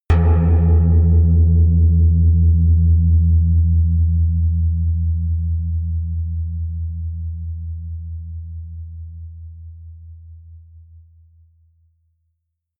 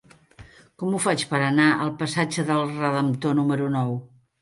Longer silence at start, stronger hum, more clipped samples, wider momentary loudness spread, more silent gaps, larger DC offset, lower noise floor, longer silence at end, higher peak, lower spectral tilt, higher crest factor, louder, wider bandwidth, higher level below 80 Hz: second, 0.1 s vs 0.4 s; neither; neither; first, 19 LU vs 8 LU; neither; neither; first, -74 dBFS vs -49 dBFS; first, 2.2 s vs 0.35 s; about the same, -4 dBFS vs -6 dBFS; first, -11.5 dB/octave vs -5.5 dB/octave; about the same, 14 dB vs 18 dB; first, -17 LUFS vs -23 LUFS; second, 2.6 kHz vs 11.5 kHz; first, -26 dBFS vs -62 dBFS